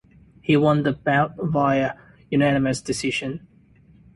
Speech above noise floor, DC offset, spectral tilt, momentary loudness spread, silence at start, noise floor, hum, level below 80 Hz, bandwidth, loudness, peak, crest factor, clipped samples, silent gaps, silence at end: 32 dB; under 0.1%; -6 dB/octave; 13 LU; 0.5 s; -53 dBFS; none; -52 dBFS; 11.5 kHz; -21 LUFS; -6 dBFS; 16 dB; under 0.1%; none; 0.8 s